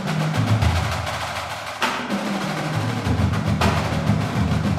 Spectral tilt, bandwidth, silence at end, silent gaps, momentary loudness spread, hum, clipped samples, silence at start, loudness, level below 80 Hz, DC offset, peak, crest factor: -5.5 dB/octave; 15 kHz; 0 s; none; 6 LU; none; under 0.1%; 0 s; -22 LUFS; -34 dBFS; under 0.1%; -6 dBFS; 16 dB